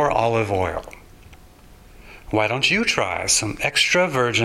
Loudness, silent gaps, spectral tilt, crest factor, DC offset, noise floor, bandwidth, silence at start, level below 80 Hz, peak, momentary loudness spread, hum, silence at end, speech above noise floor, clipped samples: -19 LUFS; none; -3 dB/octave; 22 dB; under 0.1%; -46 dBFS; 16 kHz; 0 s; -44 dBFS; 0 dBFS; 7 LU; none; 0 s; 26 dB; under 0.1%